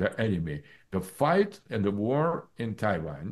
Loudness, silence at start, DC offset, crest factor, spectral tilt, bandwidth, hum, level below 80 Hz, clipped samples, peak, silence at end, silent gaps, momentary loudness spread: -29 LUFS; 0 s; under 0.1%; 16 dB; -7.5 dB/octave; 12.5 kHz; none; -56 dBFS; under 0.1%; -12 dBFS; 0 s; none; 11 LU